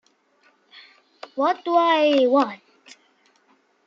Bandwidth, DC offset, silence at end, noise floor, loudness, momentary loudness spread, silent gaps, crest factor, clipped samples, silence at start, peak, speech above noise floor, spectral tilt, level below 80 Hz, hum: 7.6 kHz; under 0.1%; 1.3 s; -62 dBFS; -20 LUFS; 14 LU; none; 18 dB; under 0.1%; 1.35 s; -6 dBFS; 43 dB; -4 dB/octave; -84 dBFS; none